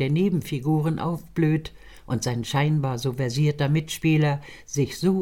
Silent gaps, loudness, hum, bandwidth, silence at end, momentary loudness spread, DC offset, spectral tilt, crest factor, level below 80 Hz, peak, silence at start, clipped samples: none; -24 LUFS; none; 16 kHz; 0 s; 6 LU; 0.3%; -6.5 dB/octave; 14 dB; -50 dBFS; -10 dBFS; 0 s; under 0.1%